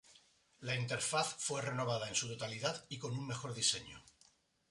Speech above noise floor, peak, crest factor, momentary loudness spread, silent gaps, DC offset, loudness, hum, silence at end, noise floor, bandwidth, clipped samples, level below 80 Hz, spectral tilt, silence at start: 32 dB; -20 dBFS; 22 dB; 9 LU; none; under 0.1%; -38 LUFS; none; 0.7 s; -71 dBFS; 11.5 kHz; under 0.1%; -72 dBFS; -2.5 dB/octave; 0.1 s